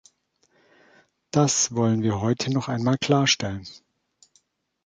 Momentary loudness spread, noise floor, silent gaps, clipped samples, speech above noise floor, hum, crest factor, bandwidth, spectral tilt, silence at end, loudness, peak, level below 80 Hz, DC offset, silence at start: 9 LU; -67 dBFS; none; under 0.1%; 44 dB; none; 20 dB; 9.6 kHz; -4 dB/octave; 1.1 s; -23 LUFS; -6 dBFS; -56 dBFS; under 0.1%; 1.35 s